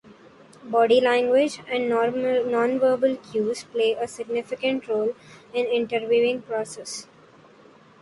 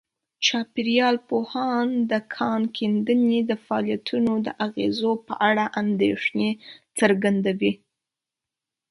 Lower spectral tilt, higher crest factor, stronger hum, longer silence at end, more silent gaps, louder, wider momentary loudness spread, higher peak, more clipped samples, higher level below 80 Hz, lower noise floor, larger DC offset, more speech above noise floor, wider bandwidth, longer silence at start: about the same, -4 dB/octave vs -5 dB/octave; about the same, 16 dB vs 20 dB; neither; second, 1 s vs 1.15 s; neither; about the same, -23 LUFS vs -23 LUFS; first, 11 LU vs 6 LU; second, -8 dBFS vs -4 dBFS; neither; about the same, -68 dBFS vs -68 dBFS; second, -52 dBFS vs -87 dBFS; neither; second, 29 dB vs 65 dB; about the same, 11.5 kHz vs 11.5 kHz; second, 0.1 s vs 0.4 s